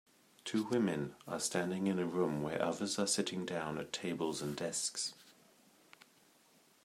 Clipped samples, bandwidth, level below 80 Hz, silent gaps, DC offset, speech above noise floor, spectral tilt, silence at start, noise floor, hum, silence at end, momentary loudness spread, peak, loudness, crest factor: under 0.1%; 16 kHz; -76 dBFS; none; under 0.1%; 31 dB; -4 dB/octave; 0.45 s; -68 dBFS; none; 1.55 s; 6 LU; -18 dBFS; -37 LUFS; 20 dB